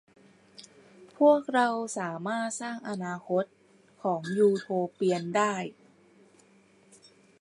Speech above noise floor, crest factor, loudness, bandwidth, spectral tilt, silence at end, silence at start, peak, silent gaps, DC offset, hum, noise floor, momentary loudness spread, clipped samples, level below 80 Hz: 33 dB; 20 dB; -28 LUFS; 11.5 kHz; -5 dB/octave; 1.7 s; 0.6 s; -10 dBFS; none; under 0.1%; none; -61 dBFS; 12 LU; under 0.1%; -82 dBFS